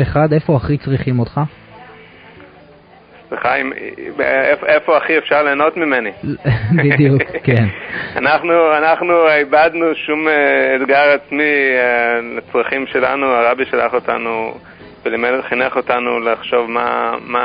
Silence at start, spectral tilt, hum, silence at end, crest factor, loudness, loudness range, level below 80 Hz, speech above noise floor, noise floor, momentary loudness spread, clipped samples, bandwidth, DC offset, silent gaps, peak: 0 s; -10.5 dB/octave; none; 0 s; 14 dB; -14 LUFS; 7 LU; -42 dBFS; 29 dB; -43 dBFS; 9 LU; under 0.1%; 5.2 kHz; under 0.1%; none; 0 dBFS